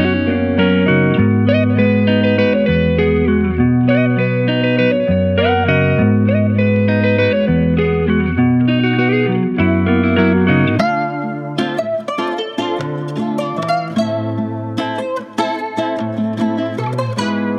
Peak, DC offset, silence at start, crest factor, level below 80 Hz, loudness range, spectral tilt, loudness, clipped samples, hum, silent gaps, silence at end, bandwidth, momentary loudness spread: -2 dBFS; under 0.1%; 0 s; 14 dB; -36 dBFS; 6 LU; -8 dB/octave; -15 LUFS; under 0.1%; none; none; 0 s; 10 kHz; 7 LU